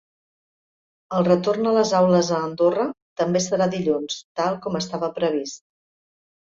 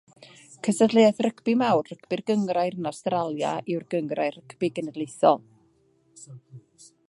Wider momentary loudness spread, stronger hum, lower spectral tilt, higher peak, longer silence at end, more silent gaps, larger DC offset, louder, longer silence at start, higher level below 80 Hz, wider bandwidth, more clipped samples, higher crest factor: about the same, 10 LU vs 12 LU; neither; about the same, -5.5 dB/octave vs -5.5 dB/octave; about the same, -4 dBFS vs -4 dBFS; first, 0.95 s vs 0.5 s; first, 3.02-3.16 s, 4.24-4.35 s vs none; neither; first, -22 LUFS vs -25 LUFS; first, 1.1 s vs 0.5 s; first, -62 dBFS vs -76 dBFS; second, 7.8 kHz vs 11.5 kHz; neither; about the same, 18 dB vs 20 dB